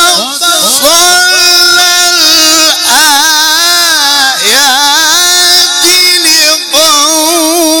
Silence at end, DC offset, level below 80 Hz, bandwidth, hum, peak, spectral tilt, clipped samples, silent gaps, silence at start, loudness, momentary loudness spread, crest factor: 0 s; under 0.1%; -46 dBFS; over 20 kHz; none; 0 dBFS; 1.5 dB/octave; 0.5%; none; 0 s; -3 LUFS; 3 LU; 6 dB